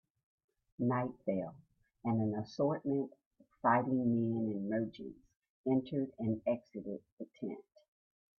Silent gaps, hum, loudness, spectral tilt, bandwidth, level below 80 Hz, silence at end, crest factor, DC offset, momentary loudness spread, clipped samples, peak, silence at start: 3.26-3.31 s, 5.50-5.64 s, 7.12-7.17 s; none; -36 LUFS; -9.5 dB/octave; 6.4 kHz; -74 dBFS; 0.8 s; 22 dB; under 0.1%; 14 LU; under 0.1%; -16 dBFS; 0.8 s